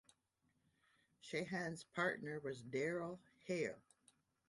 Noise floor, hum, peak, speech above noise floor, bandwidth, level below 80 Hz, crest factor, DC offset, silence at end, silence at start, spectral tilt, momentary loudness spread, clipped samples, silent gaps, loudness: -83 dBFS; none; -26 dBFS; 40 dB; 11.5 kHz; -82 dBFS; 20 dB; under 0.1%; 0.7 s; 1.25 s; -5.5 dB/octave; 11 LU; under 0.1%; none; -44 LUFS